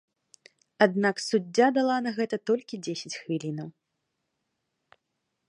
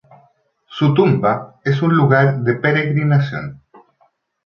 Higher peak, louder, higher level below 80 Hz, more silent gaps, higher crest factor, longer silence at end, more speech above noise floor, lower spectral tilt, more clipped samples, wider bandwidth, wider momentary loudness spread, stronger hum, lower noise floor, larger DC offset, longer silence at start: about the same, -4 dBFS vs -2 dBFS; second, -27 LUFS vs -16 LUFS; second, -80 dBFS vs -56 dBFS; neither; first, 24 dB vs 16 dB; first, 1.8 s vs 0.9 s; first, 54 dB vs 45 dB; second, -5 dB/octave vs -9 dB/octave; neither; first, 11.5 kHz vs 6 kHz; about the same, 12 LU vs 10 LU; neither; first, -81 dBFS vs -60 dBFS; neither; about the same, 0.8 s vs 0.7 s